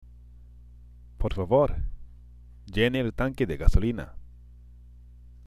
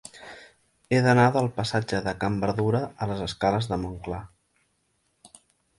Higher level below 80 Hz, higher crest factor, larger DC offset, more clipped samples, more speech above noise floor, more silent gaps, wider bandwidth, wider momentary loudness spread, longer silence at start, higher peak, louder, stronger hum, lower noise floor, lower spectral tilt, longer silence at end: first, -32 dBFS vs -50 dBFS; about the same, 24 dB vs 20 dB; neither; neither; second, 25 dB vs 47 dB; neither; about the same, 12 kHz vs 11.5 kHz; about the same, 14 LU vs 16 LU; first, 0.55 s vs 0.15 s; first, -4 dBFS vs -8 dBFS; about the same, -27 LUFS vs -25 LUFS; first, 60 Hz at -50 dBFS vs none; second, -49 dBFS vs -72 dBFS; about the same, -7.5 dB/octave vs -6.5 dB/octave; first, 1.15 s vs 0.5 s